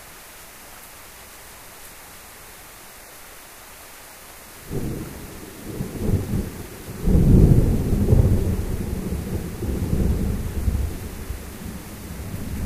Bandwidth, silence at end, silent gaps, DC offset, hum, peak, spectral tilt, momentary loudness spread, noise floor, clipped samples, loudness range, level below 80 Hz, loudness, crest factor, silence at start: 15.5 kHz; 0 s; none; under 0.1%; none; -2 dBFS; -7 dB/octave; 22 LU; -42 dBFS; under 0.1%; 20 LU; -28 dBFS; -23 LUFS; 20 dB; 0 s